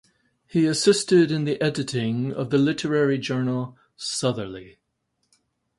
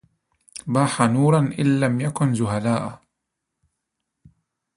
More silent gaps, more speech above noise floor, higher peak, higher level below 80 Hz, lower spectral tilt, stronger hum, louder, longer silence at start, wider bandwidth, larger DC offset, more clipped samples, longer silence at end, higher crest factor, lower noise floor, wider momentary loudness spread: neither; second, 52 dB vs 61 dB; second, -6 dBFS vs -2 dBFS; second, -62 dBFS vs -56 dBFS; second, -5 dB/octave vs -6.5 dB/octave; neither; about the same, -23 LUFS vs -21 LUFS; about the same, 0.55 s vs 0.55 s; about the same, 11.5 kHz vs 11.5 kHz; neither; neither; second, 1.1 s vs 1.8 s; about the same, 18 dB vs 20 dB; second, -75 dBFS vs -80 dBFS; about the same, 12 LU vs 11 LU